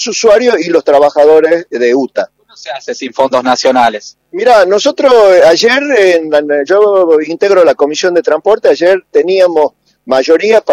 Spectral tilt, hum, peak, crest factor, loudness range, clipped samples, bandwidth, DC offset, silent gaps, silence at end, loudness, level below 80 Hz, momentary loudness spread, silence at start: -3 dB/octave; none; 0 dBFS; 8 dB; 4 LU; 2%; 11.5 kHz; under 0.1%; none; 0 s; -8 LUFS; -52 dBFS; 10 LU; 0 s